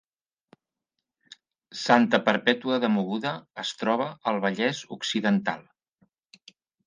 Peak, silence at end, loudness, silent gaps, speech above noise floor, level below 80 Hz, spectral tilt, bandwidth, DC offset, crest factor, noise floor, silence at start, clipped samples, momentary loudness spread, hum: -4 dBFS; 1.25 s; -25 LUFS; none; 60 dB; -76 dBFS; -5 dB/octave; 9.8 kHz; under 0.1%; 24 dB; -85 dBFS; 1.75 s; under 0.1%; 11 LU; none